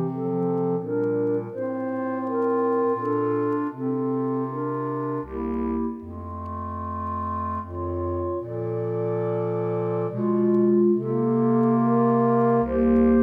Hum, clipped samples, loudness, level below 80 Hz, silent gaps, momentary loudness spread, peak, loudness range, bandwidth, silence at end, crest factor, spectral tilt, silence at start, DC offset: none; under 0.1%; -24 LUFS; -46 dBFS; none; 10 LU; -10 dBFS; 8 LU; 3.4 kHz; 0 s; 14 dB; -11.5 dB/octave; 0 s; under 0.1%